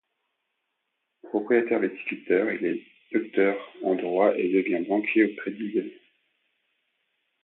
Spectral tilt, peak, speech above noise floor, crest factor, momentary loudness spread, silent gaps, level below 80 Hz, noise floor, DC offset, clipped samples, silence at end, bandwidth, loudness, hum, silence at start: -10 dB/octave; -8 dBFS; 55 dB; 18 dB; 9 LU; none; -78 dBFS; -79 dBFS; under 0.1%; under 0.1%; 1.5 s; 4.1 kHz; -26 LUFS; none; 1.25 s